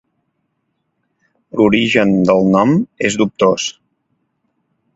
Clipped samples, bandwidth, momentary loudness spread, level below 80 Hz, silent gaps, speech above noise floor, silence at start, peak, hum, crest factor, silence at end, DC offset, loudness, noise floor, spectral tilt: under 0.1%; 8 kHz; 8 LU; -52 dBFS; none; 56 dB; 1.55 s; 0 dBFS; none; 16 dB; 1.25 s; under 0.1%; -14 LUFS; -69 dBFS; -5.5 dB/octave